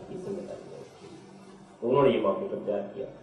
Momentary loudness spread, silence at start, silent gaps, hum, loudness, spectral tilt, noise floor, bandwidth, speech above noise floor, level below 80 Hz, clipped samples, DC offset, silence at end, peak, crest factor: 25 LU; 0 s; none; none; -28 LUFS; -7.5 dB/octave; -50 dBFS; 10.5 kHz; 23 dB; -64 dBFS; under 0.1%; under 0.1%; 0 s; -10 dBFS; 22 dB